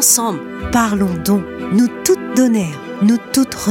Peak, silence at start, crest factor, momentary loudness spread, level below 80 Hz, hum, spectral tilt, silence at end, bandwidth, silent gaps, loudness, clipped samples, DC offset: 0 dBFS; 0 s; 14 dB; 5 LU; -40 dBFS; none; -4 dB/octave; 0 s; 17 kHz; none; -16 LUFS; under 0.1%; under 0.1%